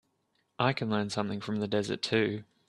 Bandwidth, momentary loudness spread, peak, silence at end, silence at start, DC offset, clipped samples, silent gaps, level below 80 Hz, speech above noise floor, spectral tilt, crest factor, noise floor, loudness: 11.5 kHz; 5 LU; -10 dBFS; 0.25 s; 0.6 s; under 0.1%; under 0.1%; none; -70 dBFS; 45 dB; -5.5 dB/octave; 22 dB; -75 dBFS; -31 LUFS